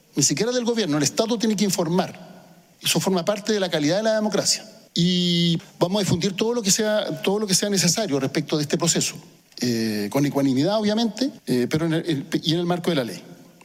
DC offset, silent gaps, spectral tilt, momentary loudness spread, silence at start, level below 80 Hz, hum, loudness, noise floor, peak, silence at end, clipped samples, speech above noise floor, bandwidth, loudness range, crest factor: under 0.1%; none; -4 dB/octave; 5 LU; 0.15 s; -60 dBFS; none; -22 LUFS; -49 dBFS; -4 dBFS; 0.2 s; under 0.1%; 27 dB; 16 kHz; 2 LU; 20 dB